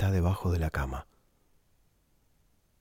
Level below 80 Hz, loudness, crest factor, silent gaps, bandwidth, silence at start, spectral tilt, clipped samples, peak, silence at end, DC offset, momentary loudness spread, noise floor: -42 dBFS; -31 LUFS; 14 dB; none; 16 kHz; 0 s; -7.5 dB/octave; under 0.1%; -18 dBFS; 1.8 s; under 0.1%; 10 LU; -68 dBFS